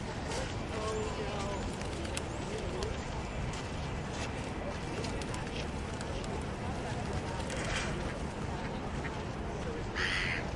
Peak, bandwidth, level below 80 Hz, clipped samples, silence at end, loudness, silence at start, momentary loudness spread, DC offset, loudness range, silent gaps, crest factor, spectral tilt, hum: -16 dBFS; 11.5 kHz; -44 dBFS; under 0.1%; 0 s; -37 LUFS; 0 s; 4 LU; under 0.1%; 1 LU; none; 20 dB; -5 dB/octave; none